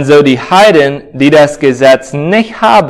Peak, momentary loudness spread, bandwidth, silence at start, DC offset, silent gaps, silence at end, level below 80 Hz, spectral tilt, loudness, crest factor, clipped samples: 0 dBFS; 6 LU; 16 kHz; 0 s; under 0.1%; none; 0 s; -44 dBFS; -5.5 dB/octave; -7 LUFS; 6 dB; 5%